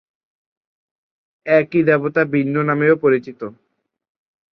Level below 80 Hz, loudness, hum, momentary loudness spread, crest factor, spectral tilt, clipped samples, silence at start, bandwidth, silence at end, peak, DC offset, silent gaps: -62 dBFS; -17 LUFS; none; 18 LU; 18 dB; -10 dB/octave; under 0.1%; 1.45 s; 5.8 kHz; 1 s; -2 dBFS; under 0.1%; none